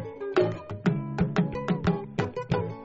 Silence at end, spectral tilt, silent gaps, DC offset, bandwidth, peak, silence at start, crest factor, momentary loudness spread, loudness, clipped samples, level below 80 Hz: 0 s; -7 dB/octave; none; under 0.1%; 7.8 kHz; -10 dBFS; 0 s; 18 dB; 4 LU; -28 LUFS; under 0.1%; -48 dBFS